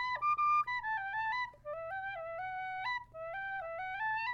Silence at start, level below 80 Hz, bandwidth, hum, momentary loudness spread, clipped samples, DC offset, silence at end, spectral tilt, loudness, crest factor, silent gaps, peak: 0 s; -66 dBFS; 7.4 kHz; none; 11 LU; under 0.1%; under 0.1%; 0 s; -3 dB/octave; -36 LUFS; 12 dB; none; -24 dBFS